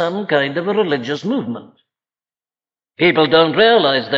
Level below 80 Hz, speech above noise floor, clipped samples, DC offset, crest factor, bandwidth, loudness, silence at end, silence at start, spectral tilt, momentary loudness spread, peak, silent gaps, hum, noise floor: -62 dBFS; over 75 dB; under 0.1%; under 0.1%; 16 dB; 7.4 kHz; -15 LUFS; 0 s; 0 s; -6 dB/octave; 10 LU; -2 dBFS; none; none; under -90 dBFS